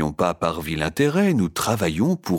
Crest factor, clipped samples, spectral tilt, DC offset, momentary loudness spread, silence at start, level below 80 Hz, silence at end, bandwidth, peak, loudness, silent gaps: 16 dB; under 0.1%; -5.5 dB/octave; under 0.1%; 6 LU; 0 s; -44 dBFS; 0 s; 18 kHz; -6 dBFS; -22 LUFS; none